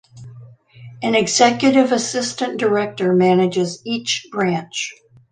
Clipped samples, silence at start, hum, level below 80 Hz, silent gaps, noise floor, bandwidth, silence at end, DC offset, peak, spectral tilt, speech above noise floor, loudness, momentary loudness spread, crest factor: under 0.1%; 0.15 s; none; -62 dBFS; none; -42 dBFS; 9.8 kHz; 0.4 s; under 0.1%; -2 dBFS; -4 dB/octave; 24 dB; -18 LUFS; 10 LU; 18 dB